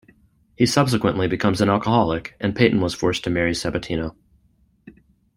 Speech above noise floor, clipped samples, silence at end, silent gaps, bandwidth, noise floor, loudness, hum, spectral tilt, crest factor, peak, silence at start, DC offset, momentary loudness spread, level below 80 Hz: 41 dB; under 0.1%; 0.45 s; none; 16 kHz; -61 dBFS; -21 LUFS; none; -5.5 dB/octave; 20 dB; -2 dBFS; 0.6 s; under 0.1%; 7 LU; -46 dBFS